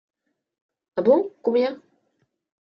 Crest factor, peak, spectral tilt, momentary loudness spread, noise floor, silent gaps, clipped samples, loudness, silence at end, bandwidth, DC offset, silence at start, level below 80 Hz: 20 dB; -6 dBFS; -8.5 dB/octave; 12 LU; -72 dBFS; none; under 0.1%; -22 LUFS; 1 s; 5.8 kHz; under 0.1%; 0.95 s; -74 dBFS